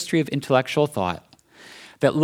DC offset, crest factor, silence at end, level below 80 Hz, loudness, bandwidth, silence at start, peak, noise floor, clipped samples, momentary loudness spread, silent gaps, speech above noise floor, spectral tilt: under 0.1%; 20 dB; 0 s; -60 dBFS; -23 LUFS; 17 kHz; 0 s; -2 dBFS; -48 dBFS; under 0.1%; 18 LU; none; 26 dB; -6 dB/octave